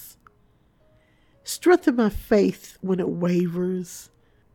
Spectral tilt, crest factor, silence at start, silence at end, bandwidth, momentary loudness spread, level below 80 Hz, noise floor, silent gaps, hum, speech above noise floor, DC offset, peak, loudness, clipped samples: -6 dB/octave; 20 dB; 0 s; 0.5 s; 18 kHz; 16 LU; -48 dBFS; -61 dBFS; none; none; 39 dB; under 0.1%; -6 dBFS; -23 LUFS; under 0.1%